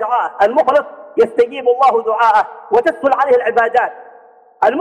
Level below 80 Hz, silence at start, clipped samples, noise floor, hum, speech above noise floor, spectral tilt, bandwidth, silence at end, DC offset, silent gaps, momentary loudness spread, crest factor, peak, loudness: -58 dBFS; 0 s; under 0.1%; -44 dBFS; none; 30 dB; -4.5 dB/octave; 9.6 kHz; 0 s; under 0.1%; none; 5 LU; 12 dB; -2 dBFS; -14 LUFS